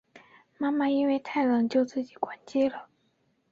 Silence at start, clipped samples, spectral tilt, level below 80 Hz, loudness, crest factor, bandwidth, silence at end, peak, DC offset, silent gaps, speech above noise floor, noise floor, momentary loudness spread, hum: 0.15 s; under 0.1%; -6 dB/octave; -74 dBFS; -28 LUFS; 18 dB; 7.6 kHz; 0.65 s; -10 dBFS; under 0.1%; none; 44 dB; -71 dBFS; 9 LU; none